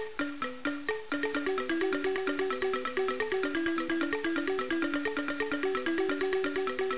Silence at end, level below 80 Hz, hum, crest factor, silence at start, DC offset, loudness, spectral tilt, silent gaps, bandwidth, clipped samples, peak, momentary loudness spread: 0 s; -62 dBFS; none; 14 dB; 0 s; 0.6%; -31 LUFS; -2 dB/octave; none; 4 kHz; under 0.1%; -18 dBFS; 4 LU